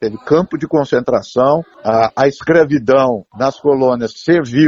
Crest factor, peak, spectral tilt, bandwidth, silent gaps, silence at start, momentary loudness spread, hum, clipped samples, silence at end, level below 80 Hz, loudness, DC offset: 14 dB; 0 dBFS; -7 dB/octave; 7.6 kHz; none; 0 s; 5 LU; none; under 0.1%; 0 s; -50 dBFS; -14 LUFS; under 0.1%